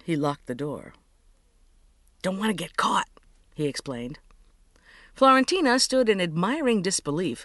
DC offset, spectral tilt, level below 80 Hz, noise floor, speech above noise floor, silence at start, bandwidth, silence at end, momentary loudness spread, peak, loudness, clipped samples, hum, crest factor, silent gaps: under 0.1%; -4 dB/octave; -56 dBFS; -60 dBFS; 36 dB; 0.05 s; 11.5 kHz; 0 s; 15 LU; -8 dBFS; -24 LUFS; under 0.1%; none; 18 dB; none